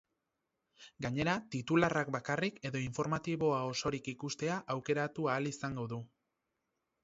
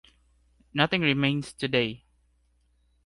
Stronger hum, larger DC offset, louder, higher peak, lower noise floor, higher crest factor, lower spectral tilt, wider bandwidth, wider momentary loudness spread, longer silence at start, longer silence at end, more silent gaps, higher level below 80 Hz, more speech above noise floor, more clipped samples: neither; neither; second, -36 LUFS vs -26 LUFS; second, -14 dBFS vs -6 dBFS; first, -86 dBFS vs -67 dBFS; about the same, 22 dB vs 24 dB; about the same, -5 dB/octave vs -5.5 dB/octave; second, 7.6 kHz vs 11.5 kHz; about the same, 9 LU vs 10 LU; about the same, 0.8 s vs 0.75 s; about the same, 1 s vs 1.1 s; neither; second, -66 dBFS vs -60 dBFS; first, 51 dB vs 41 dB; neither